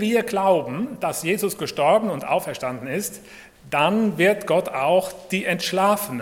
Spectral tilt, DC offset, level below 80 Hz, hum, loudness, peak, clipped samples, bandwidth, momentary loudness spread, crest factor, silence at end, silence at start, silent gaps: -4.5 dB/octave; under 0.1%; -60 dBFS; none; -22 LUFS; -4 dBFS; under 0.1%; 17 kHz; 9 LU; 18 dB; 0 s; 0 s; none